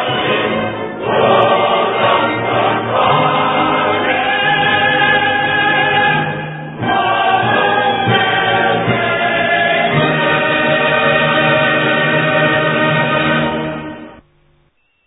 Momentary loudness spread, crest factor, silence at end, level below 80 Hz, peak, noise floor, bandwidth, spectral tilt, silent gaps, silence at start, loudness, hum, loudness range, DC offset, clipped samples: 6 LU; 14 dB; 0.9 s; -46 dBFS; 0 dBFS; -57 dBFS; 4 kHz; -9 dB/octave; none; 0 s; -13 LUFS; none; 1 LU; under 0.1%; under 0.1%